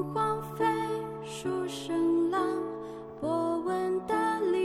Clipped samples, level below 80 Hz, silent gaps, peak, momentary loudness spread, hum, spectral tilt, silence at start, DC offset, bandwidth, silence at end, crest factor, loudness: under 0.1%; -64 dBFS; none; -16 dBFS; 9 LU; none; -6 dB/octave; 0 s; under 0.1%; 14.5 kHz; 0 s; 14 dB; -31 LUFS